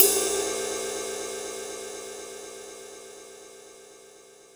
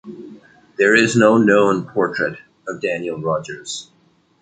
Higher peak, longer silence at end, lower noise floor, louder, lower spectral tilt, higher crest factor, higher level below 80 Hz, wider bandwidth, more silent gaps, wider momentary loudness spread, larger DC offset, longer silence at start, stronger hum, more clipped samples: about the same, 0 dBFS vs -2 dBFS; second, 0 s vs 0.6 s; second, -52 dBFS vs -58 dBFS; second, -29 LUFS vs -17 LUFS; second, -0.5 dB/octave vs -5 dB/octave; first, 30 dB vs 18 dB; about the same, -64 dBFS vs -60 dBFS; first, over 20 kHz vs 9.4 kHz; neither; about the same, 22 LU vs 20 LU; neither; about the same, 0 s vs 0.05 s; neither; neither